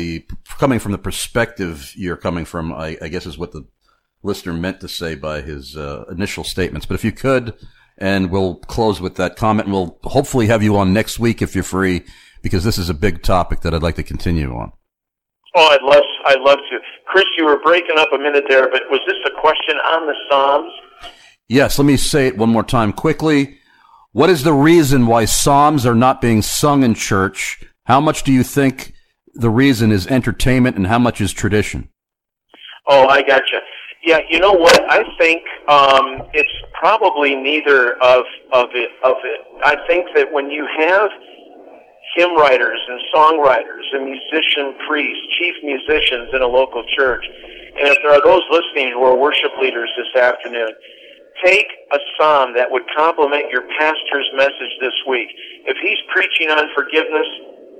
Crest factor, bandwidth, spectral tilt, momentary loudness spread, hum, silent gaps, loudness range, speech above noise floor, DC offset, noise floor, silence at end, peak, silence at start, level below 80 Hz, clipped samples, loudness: 14 dB; 16.5 kHz; -4.5 dB/octave; 13 LU; none; none; 8 LU; 68 dB; under 0.1%; -83 dBFS; 0.3 s; 0 dBFS; 0 s; -34 dBFS; under 0.1%; -15 LUFS